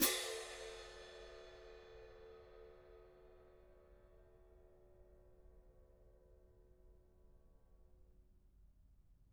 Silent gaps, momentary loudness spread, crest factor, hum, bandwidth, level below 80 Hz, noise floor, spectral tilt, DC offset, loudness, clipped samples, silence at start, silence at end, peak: none; 21 LU; 30 dB; none; 17.5 kHz; -68 dBFS; -68 dBFS; -1 dB/octave; under 0.1%; -47 LUFS; under 0.1%; 0 s; 0 s; -20 dBFS